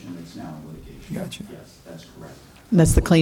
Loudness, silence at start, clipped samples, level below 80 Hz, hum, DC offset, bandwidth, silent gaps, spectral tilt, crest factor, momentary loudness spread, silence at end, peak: -21 LUFS; 0.05 s; under 0.1%; -32 dBFS; none; under 0.1%; 17 kHz; none; -6 dB/octave; 20 dB; 25 LU; 0 s; -4 dBFS